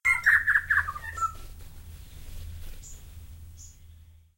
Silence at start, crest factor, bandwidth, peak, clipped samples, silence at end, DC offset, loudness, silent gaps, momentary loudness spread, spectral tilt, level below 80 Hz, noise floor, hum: 0.05 s; 22 dB; 16 kHz; -8 dBFS; under 0.1%; 0.25 s; under 0.1%; -24 LUFS; none; 27 LU; -2 dB/octave; -44 dBFS; -52 dBFS; none